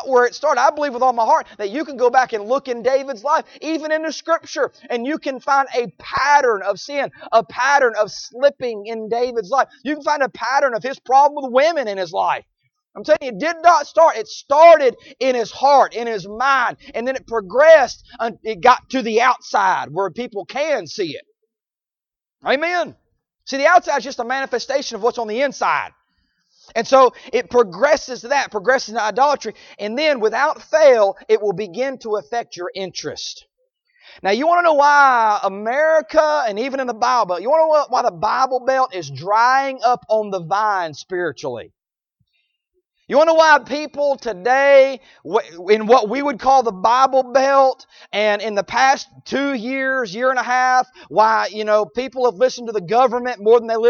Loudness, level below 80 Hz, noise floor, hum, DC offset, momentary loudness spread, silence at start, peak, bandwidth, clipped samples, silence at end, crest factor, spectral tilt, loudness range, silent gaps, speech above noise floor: -17 LUFS; -60 dBFS; under -90 dBFS; none; under 0.1%; 12 LU; 0 s; 0 dBFS; 7.2 kHz; under 0.1%; 0 s; 18 dB; -3.5 dB/octave; 5 LU; none; over 73 dB